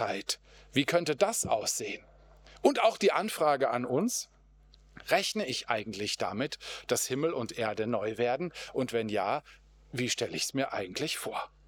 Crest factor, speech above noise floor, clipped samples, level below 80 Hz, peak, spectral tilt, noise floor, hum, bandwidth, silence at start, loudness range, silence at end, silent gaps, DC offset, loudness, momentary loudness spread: 22 dB; 28 dB; under 0.1%; -64 dBFS; -10 dBFS; -3 dB/octave; -59 dBFS; none; over 20 kHz; 0 s; 4 LU; 0.2 s; none; under 0.1%; -31 LUFS; 8 LU